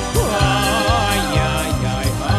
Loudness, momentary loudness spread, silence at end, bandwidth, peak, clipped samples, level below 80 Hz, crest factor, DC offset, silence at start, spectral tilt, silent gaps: -17 LUFS; 4 LU; 0 s; 14 kHz; -2 dBFS; under 0.1%; -26 dBFS; 14 dB; under 0.1%; 0 s; -4.5 dB/octave; none